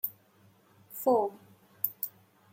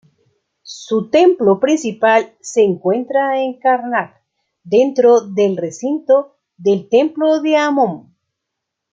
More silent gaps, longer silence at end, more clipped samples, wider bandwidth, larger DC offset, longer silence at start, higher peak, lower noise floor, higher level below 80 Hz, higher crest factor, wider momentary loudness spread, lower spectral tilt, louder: neither; second, 0.45 s vs 0.9 s; neither; first, 16.5 kHz vs 8.8 kHz; neither; second, 0.05 s vs 0.65 s; second, -10 dBFS vs 0 dBFS; second, -63 dBFS vs -78 dBFS; second, -88 dBFS vs -66 dBFS; first, 24 dB vs 14 dB; about the same, 11 LU vs 9 LU; about the same, -5.5 dB/octave vs -5.5 dB/octave; second, -32 LUFS vs -15 LUFS